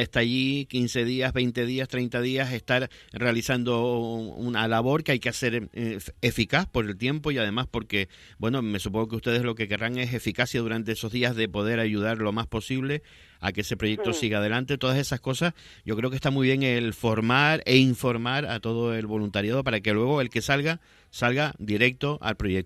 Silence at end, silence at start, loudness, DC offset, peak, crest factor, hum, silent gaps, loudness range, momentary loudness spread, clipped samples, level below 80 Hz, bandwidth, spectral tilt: 0 s; 0 s; -26 LUFS; under 0.1%; -4 dBFS; 24 dB; none; none; 4 LU; 6 LU; under 0.1%; -50 dBFS; 14 kHz; -5.5 dB/octave